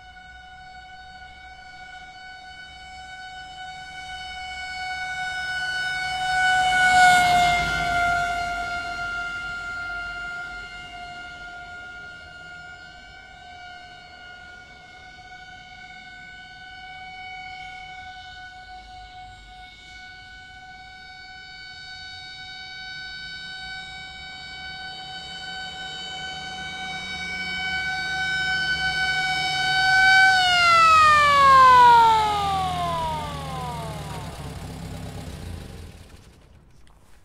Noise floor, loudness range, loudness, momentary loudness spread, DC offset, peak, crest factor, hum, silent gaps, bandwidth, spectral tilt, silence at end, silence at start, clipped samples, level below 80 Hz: -50 dBFS; 25 LU; -20 LUFS; 27 LU; under 0.1%; -4 dBFS; 20 dB; none; none; 16 kHz; -2 dB/octave; 0.1 s; 0 s; under 0.1%; -48 dBFS